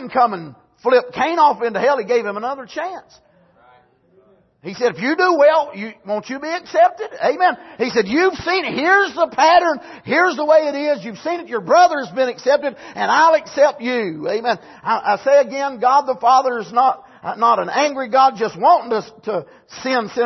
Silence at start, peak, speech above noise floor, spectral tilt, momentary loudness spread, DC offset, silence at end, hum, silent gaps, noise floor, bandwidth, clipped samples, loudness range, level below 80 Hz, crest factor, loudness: 0 s; -2 dBFS; 38 dB; -4 dB/octave; 12 LU; under 0.1%; 0 s; none; none; -54 dBFS; 6.2 kHz; under 0.1%; 4 LU; -60 dBFS; 16 dB; -17 LUFS